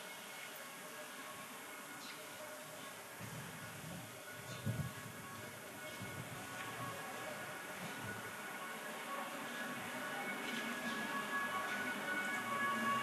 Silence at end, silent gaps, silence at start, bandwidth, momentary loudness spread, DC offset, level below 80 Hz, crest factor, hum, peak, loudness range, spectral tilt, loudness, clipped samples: 0 s; none; 0 s; 13 kHz; 10 LU; under 0.1%; -76 dBFS; 18 dB; none; -26 dBFS; 8 LU; -3.5 dB/octave; -44 LUFS; under 0.1%